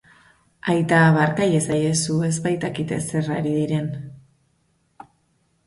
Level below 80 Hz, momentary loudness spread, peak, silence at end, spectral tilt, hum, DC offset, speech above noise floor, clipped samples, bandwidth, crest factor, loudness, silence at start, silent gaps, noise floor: -56 dBFS; 11 LU; -6 dBFS; 1.45 s; -5.5 dB/octave; none; under 0.1%; 46 dB; under 0.1%; 11.5 kHz; 18 dB; -21 LUFS; 0.65 s; none; -66 dBFS